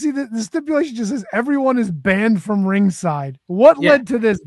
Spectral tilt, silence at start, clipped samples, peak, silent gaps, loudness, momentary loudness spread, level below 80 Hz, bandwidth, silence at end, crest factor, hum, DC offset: -6.5 dB/octave; 0 s; under 0.1%; 0 dBFS; none; -17 LUFS; 11 LU; -54 dBFS; 12 kHz; 0.05 s; 16 dB; none; under 0.1%